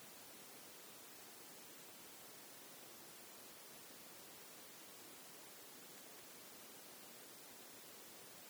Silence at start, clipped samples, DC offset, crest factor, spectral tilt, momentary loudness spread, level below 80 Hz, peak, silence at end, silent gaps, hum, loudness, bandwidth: 0 s; under 0.1%; under 0.1%; 16 dB; -1 dB/octave; 0 LU; under -90 dBFS; -42 dBFS; 0 s; none; none; -55 LUFS; over 20 kHz